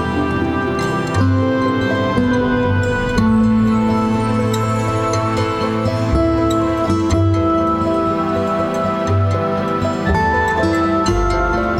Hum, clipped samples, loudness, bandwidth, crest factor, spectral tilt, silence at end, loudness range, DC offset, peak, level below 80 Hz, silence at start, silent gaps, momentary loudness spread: none; under 0.1%; -17 LUFS; 12.5 kHz; 14 dB; -7 dB/octave; 0 s; 1 LU; under 0.1%; -2 dBFS; -30 dBFS; 0 s; none; 3 LU